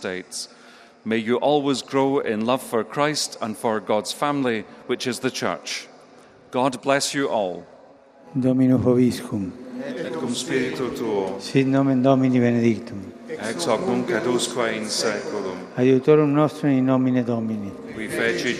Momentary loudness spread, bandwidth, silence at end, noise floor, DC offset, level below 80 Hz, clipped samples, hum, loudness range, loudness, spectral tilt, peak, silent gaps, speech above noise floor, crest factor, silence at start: 12 LU; 14.5 kHz; 0 s; -49 dBFS; under 0.1%; -62 dBFS; under 0.1%; none; 4 LU; -22 LUFS; -5 dB/octave; -2 dBFS; none; 28 dB; 20 dB; 0 s